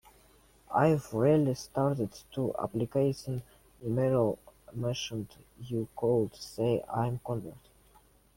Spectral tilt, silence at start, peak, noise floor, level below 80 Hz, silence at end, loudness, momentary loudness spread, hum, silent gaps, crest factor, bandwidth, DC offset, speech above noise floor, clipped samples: -7 dB/octave; 0.7 s; -12 dBFS; -62 dBFS; -60 dBFS; 0.8 s; -31 LUFS; 13 LU; none; none; 18 dB; 16.5 kHz; under 0.1%; 32 dB; under 0.1%